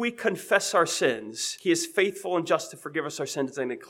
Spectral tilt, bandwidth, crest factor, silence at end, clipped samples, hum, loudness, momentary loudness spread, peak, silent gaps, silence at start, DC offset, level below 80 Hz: -3 dB/octave; 17 kHz; 22 dB; 0 s; under 0.1%; none; -27 LUFS; 8 LU; -6 dBFS; none; 0 s; under 0.1%; -80 dBFS